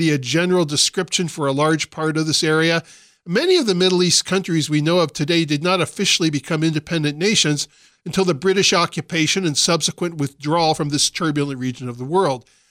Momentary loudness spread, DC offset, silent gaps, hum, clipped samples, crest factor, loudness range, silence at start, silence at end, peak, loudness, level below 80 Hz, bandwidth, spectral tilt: 7 LU; under 0.1%; none; none; under 0.1%; 16 dB; 2 LU; 0 s; 0.3 s; -4 dBFS; -18 LUFS; -58 dBFS; 16 kHz; -3.5 dB/octave